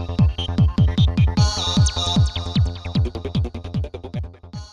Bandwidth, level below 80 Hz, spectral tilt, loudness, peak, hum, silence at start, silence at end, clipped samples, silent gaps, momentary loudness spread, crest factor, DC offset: 10.5 kHz; -26 dBFS; -5.5 dB/octave; -20 LUFS; -6 dBFS; none; 0 s; 0.05 s; under 0.1%; none; 13 LU; 14 dB; under 0.1%